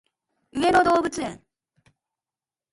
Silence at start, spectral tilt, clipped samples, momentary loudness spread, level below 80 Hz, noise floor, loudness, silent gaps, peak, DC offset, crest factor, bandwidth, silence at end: 0.55 s; -4 dB/octave; under 0.1%; 16 LU; -54 dBFS; under -90 dBFS; -21 LUFS; none; -6 dBFS; under 0.1%; 20 dB; 11.5 kHz; 1.35 s